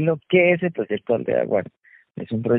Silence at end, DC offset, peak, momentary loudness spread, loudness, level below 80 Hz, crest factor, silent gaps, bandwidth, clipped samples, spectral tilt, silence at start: 0 s; under 0.1%; -4 dBFS; 20 LU; -21 LUFS; -62 dBFS; 18 dB; none; 4 kHz; under 0.1%; -11.5 dB/octave; 0 s